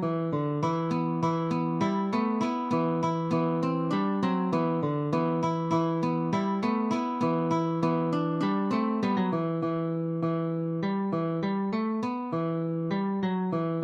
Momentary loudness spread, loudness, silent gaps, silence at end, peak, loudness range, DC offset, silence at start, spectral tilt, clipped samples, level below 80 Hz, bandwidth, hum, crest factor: 3 LU; -28 LUFS; none; 0 s; -14 dBFS; 2 LU; under 0.1%; 0 s; -8 dB/octave; under 0.1%; -72 dBFS; 7.8 kHz; none; 14 dB